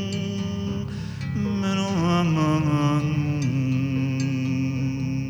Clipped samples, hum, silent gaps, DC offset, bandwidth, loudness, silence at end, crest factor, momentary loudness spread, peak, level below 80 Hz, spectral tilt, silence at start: under 0.1%; none; none; under 0.1%; 19.5 kHz; -24 LUFS; 0 s; 12 dB; 7 LU; -12 dBFS; -46 dBFS; -7 dB/octave; 0 s